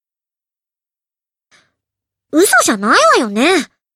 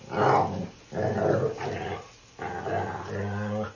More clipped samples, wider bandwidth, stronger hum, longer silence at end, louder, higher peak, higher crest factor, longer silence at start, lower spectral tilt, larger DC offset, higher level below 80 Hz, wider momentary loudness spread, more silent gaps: neither; first, 17 kHz vs 7.2 kHz; neither; first, 0.3 s vs 0 s; first, -11 LUFS vs -29 LUFS; first, 0 dBFS vs -10 dBFS; about the same, 16 dB vs 18 dB; first, 2.35 s vs 0 s; second, -2 dB/octave vs -7 dB/octave; neither; second, -58 dBFS vs -52 dBFS; second, 6 LU vs 13 LU; neither